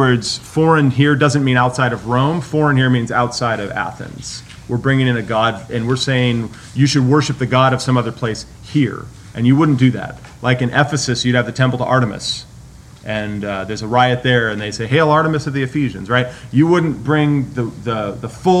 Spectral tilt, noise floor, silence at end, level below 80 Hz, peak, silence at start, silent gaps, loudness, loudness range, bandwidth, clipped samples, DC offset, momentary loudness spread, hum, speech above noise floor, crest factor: -6 dB/octave; -38 dBFS; 0 s; -44 dBFS; 0 dBFS; 0 s; none; -16 LUFS; 3 LU; 11.5 kHz; under 0.1%; under 0.1%; 10 LU; none; 23 dB; 16 dB